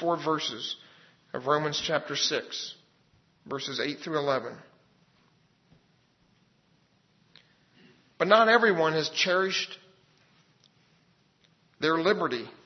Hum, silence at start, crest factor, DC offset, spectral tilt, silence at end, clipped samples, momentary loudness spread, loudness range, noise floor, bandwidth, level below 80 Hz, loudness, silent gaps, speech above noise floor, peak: none; 0 s; 26 dB; under 0.1%; -3.5 dB/octave; 0.15 s; under 0.1%; 17 LU; 9 LU; -67 dBFS; 6.4 kHz; -76 dBFS; -27 LUFS; none; 40 dB; -6 dBFS